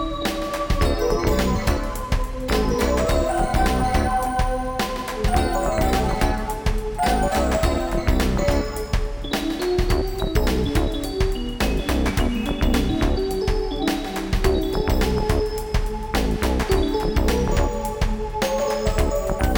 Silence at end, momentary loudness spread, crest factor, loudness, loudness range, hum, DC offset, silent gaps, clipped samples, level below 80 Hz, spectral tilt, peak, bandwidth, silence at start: 0 s; 5 LU; 16 dB; -23 LUFS; 1 LU; none; under 0.1%; none; under 0.1%; -24 dBFS; -5.5 dB/octave; -4 dBFS; over 20 kHz; 0 s